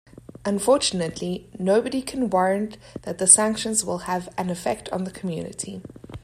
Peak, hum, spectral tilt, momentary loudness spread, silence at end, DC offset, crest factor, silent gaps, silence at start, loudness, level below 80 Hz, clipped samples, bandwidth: 0 dBFS; none; -3 dB/octave; 18 LU; 0.05 s; under 0.1%; 24 dB; none; 0.45 s; -22 LUFS; -54 dBFS; under 0.1%; 15.5 kHz